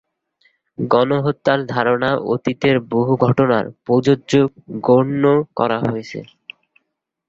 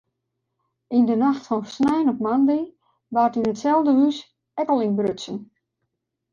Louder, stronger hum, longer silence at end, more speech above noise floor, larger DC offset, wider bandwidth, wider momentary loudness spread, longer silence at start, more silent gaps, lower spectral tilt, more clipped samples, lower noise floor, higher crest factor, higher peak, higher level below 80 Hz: first, -17 LUFS vs -21 LUFS; neither; first, 1.05 s vs 0.9 s; about the same, 59 dB vs 58 dB; neither; about the same, 7.8 kHz vs 7.4 kHz; second, 9 LU vs 14 LU; about the same, 0.8 s vs 0.9 s; neither; about the same, -7.5 dB/octave vs -6.5 dB/octave; neither; about the same, -75 dBFS vs -78 dBFS; about the same, 16 dB vs 14 dB; first, -2 dBFS vs -8 dBFS; first, -54 dBFS vs -64 dBFS